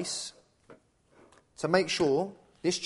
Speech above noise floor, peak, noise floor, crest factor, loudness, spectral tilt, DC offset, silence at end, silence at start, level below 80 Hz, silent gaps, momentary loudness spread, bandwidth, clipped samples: 34 dB; -8 dBFS; -62 dBFS; 24 dB; -30 LUFS; -4 dB/octave; under 0.1%; 0 s; 0 s; -68 dBFS; none; 12 LU; 11.5 kHz; under 0.1%